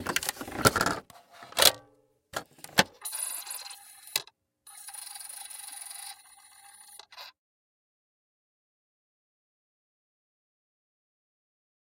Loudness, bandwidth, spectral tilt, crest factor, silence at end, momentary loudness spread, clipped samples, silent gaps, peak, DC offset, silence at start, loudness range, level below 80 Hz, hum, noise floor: -29 LUFS; 17 kHz; -1.5 dB/octave; 34 dB; 4.55 s; 26 LU; under 0.1%; none; -2 dBFS; under 0.1%; 0 s; 21 LU; -60 dBFS; 60 Hz at -75 dBFS; -65 dBFS